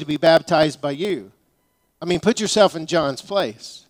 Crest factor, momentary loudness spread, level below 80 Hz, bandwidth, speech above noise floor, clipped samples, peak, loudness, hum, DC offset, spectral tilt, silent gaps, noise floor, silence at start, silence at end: 20 dB; 10 LU; -56 dBFS; 16 kHz; 47 dB; under 0.1%; -2 dBFS; -19 LUFS; none; under 0.1%; -4.5 dB/octave; none; -66 dBFS; 0 s; 0.1 s